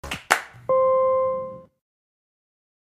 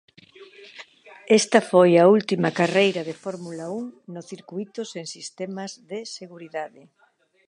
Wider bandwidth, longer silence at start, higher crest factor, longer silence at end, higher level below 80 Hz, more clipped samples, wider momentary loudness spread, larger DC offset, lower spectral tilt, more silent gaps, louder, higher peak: first, 15 kHz vs 11 kHz; second, 0.05 s vs 0.4 s; about the same, 24 dB vs 22 dB; first, 1.25 s vs 0.8 s; first, -54 dBFS vs -76 dBFS; neither; second, 10 LU vs 22 LU; neither; second, -2.5 dB/octave vs -5 dB/octave; neither; about the same, -22 LUFS vs -21 LUFS; about the same, -2 dBFS vs -2 dBFS